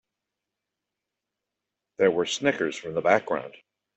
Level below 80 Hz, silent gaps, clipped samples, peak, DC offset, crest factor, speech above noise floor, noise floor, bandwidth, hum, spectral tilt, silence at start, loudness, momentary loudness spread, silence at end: -70 dBFS; none; under 0.1%; -6 dBFS; under 0.1%; 24 dB; 61 dB; -86 dBFS; 8.2 kHz; none; -4 dB/octave; 2 s; -25 LUFS; 9 LU; 0.45 s